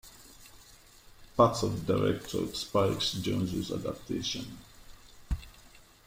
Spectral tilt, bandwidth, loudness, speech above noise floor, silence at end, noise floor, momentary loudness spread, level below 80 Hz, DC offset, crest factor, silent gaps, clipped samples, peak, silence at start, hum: -5.5 dB/octave; 16.5 kHz; -31 LUFS; 26 dB; 0.4 s; -56 dBFS; 25 LU; -48 dBFS; under 0.1%; 24 dB; none; under 0.1%; -10 dBFS; 0.05 s; none